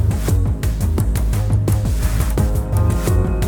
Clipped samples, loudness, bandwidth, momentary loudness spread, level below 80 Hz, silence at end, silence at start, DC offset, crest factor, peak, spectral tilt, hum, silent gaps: under 0.1%; -19 LUFS; over 20 kHz; 2 LU; -20 dBFS; 0 s; 0 s; under 0.1%; 12 dB; -4 dBFS; -6.5 dB/octave; none; none